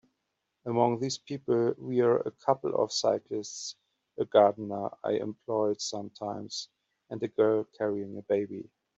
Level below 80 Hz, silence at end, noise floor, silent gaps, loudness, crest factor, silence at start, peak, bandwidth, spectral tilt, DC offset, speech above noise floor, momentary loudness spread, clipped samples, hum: -76 dBFS; 0.35 s; -82 dBFS; none; -30 LUFS; 20 dB; 0.65 s; -10 dBFS; 8.2 kHz; -5 dB/octave; under 0.1%; 53 dB; 12 LU; under 0.1%; none